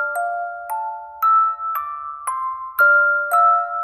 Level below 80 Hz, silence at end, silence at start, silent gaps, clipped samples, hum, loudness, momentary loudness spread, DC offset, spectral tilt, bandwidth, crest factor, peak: -68 dBFS; 0 s; 0 s; none; under 0.1%; none; -18 LUFS; 13 LU; under 0.1%; 0 dB/octave; 15.5 kHz; 14 dB; -6 dBFS